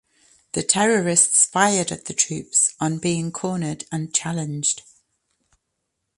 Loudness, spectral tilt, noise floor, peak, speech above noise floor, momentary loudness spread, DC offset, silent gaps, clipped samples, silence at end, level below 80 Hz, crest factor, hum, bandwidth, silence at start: -20 LUFS; -3 dB/octave; -77 dBFS; 0 dBFS; 56 dB; 12 LU; under 0.1%; none; under 0.1%; 1.4 s; -62 dBFS; 22 dB; none; 11.5 kHz; 0.55 s